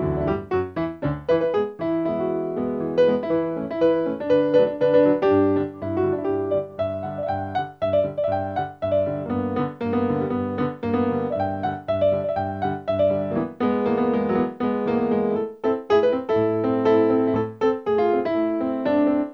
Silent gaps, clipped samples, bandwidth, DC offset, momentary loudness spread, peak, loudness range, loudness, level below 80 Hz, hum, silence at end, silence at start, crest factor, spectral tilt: none; under 0.1%; 6.2 kHz; under 0.1%; 7 LU; -6 dBFS; 4 LU; -23 LUFS; -52 dBFS; none; 0 s; 0 s; 16 dB; -9 dB/octave